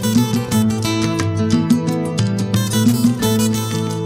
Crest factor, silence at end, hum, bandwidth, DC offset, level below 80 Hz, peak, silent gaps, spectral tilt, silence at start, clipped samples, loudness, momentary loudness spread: 14 dB; 0 s; none; 16.5 kHz; under 0.1%; -46 dBFS; -2 dBFS; none; -5.5 dB/octave; 0 s; under 0.1%; -17 LUFS; 4 LU